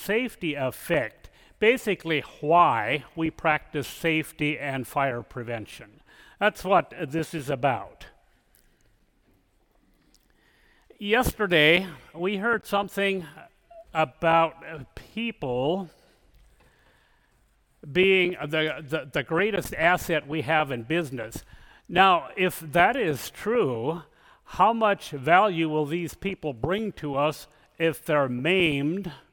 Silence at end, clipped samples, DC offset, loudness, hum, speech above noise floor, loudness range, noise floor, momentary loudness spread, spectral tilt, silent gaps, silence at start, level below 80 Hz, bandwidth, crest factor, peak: 0.15 s; under 0.1%; under 0.1%; -25 LUFS; none; 40 dB; 5 LU; -65 dBFS; 13 LU; -5 dB/octave; none; 0 s; -52 dBFS; 18 kHz; 22 dB; -4 dBFS